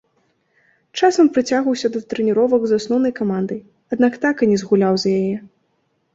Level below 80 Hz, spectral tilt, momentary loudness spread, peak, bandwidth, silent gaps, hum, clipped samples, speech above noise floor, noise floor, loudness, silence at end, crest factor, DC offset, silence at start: -60 dBFS; -6 dB/octave; 10 LU; -2 dBFS; 8 kHz; none; none; under 0.1%; 49 dB; -66 dBFS; -18 LUFS; 0.7 s; 16 dB; under 0.1%; 0.95 s